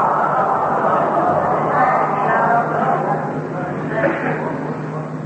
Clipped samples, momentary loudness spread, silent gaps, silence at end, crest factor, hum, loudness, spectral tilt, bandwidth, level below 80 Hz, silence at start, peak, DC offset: under 0.1%; 8 LU; none; 0 s; 14 dB; none; -18 LUFS; -8 dB/octave; 8.6 kHz; -56 dBFS; 0 s; -4 dBFS; under 0.1%